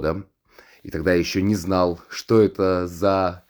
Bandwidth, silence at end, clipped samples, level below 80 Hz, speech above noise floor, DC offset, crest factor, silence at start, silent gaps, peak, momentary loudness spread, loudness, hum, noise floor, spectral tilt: over 20 kHz; 0.1 s; under 0.1%; -46 dBFS; 32 dB; under 0.1%; 18 dB; 0 s; none; -4 dBFS; 11 LU; -21 LUFS; none; -52 dBFS; -6 dB/octave